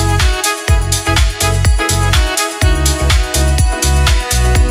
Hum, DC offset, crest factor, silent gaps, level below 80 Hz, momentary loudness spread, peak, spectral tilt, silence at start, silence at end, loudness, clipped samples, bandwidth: none; under 0.1%; 12 dB; none; -14 dBFS; 1 LU; 0 dBFS; -3.5 dB/octave; 0 s; 0 s; -13 LUFS; under 0.1%; 16 kHz